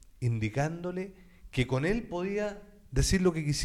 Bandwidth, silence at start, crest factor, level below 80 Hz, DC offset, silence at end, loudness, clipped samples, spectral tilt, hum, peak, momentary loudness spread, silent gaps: 15.5 kHz; 0.2 s; 16 dB; -42 dBFS; under 0.1%; 0 s; -31 LUFS; under 0.1%; -5.5 dB/octave; none; -16 dBFS; 10 LU; none